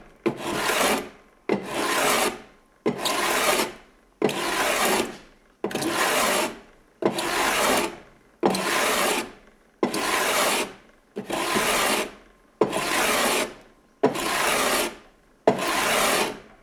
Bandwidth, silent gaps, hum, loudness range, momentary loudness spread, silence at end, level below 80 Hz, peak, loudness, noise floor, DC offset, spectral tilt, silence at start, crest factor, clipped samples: over 20 kHz; none; none; 1 LU; 10 LU; 0.2 s; -54 dBFS; -4 dBFS; -24 LUFS; -54 dBFS; under 0.1%; -2 dB/octave; 0 s; 22 dB; under 0.1%